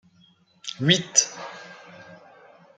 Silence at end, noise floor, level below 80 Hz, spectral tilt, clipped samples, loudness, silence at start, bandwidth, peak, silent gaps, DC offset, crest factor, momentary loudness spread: 0.6 s; -59 dBFS; -68 dBFS; -2 dB/octave; under 0.1%; -21 LUFS; 0.65 s; 9.4 kHz; -2 dBFS; none; under 0.1%; 28 dB; 26 LU